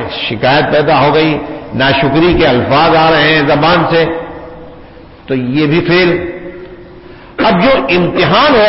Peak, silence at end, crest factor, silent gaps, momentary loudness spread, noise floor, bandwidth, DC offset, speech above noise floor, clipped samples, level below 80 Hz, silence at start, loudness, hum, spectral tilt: 0 dBFS; 0 s; 10 dB; none; 15 LU; -34 dBFS; 5.8 kHz; under 0.1%; 25 dB; under 0.1%; -34 dBFS; 0 s; -10 LUFS; none; -9.5 dB/octave